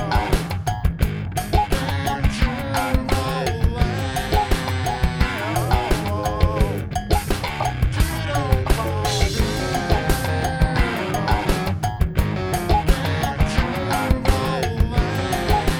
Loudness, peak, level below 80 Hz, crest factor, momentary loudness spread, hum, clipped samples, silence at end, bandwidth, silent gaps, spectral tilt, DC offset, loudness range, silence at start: -22 LUFS; -2 dBFS; -24 dBFS; 18 dB; 3 LU; none; under 0.1%; 0 s; over 20 kHz; none; -5.5 dB/octave; under 0.1%; 1 LU; 0 s